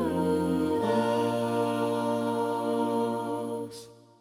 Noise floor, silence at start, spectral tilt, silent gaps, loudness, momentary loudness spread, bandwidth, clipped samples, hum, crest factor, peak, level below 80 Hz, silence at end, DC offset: -48 dBFS; 0 s; -6.5 dB/octave; none; -28 LUFS; 8 LU; 16.5 kHz; under 0.1%; none; 14 dB; -14 dBFS; -62 dBFS; 0.25 s; under 0.1%